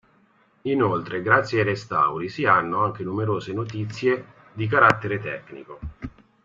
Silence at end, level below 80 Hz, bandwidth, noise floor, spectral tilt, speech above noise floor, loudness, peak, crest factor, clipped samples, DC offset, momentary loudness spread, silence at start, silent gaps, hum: 0.35 s; -52 dBFS; 7.8 kHz; -60 dBFS; -7 dB/octave; 37 dB; -22 LUFS; 0 dBFS; 24 dB; under 0.1%; under 0.1%; 19 LU; 0.65 s; none; none